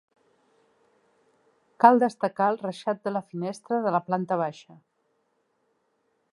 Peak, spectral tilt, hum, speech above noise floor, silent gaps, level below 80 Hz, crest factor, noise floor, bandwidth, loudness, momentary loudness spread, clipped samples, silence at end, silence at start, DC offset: -2 dBFS; -7 dB/octave; none; 48 dB; none; -82 dBFS; 26 dB; -73 dBFS; 11.5 kHz; -25 LUFS; 13 LU; under 0.1%; 1.8 s; 1.8 s; under 0.1%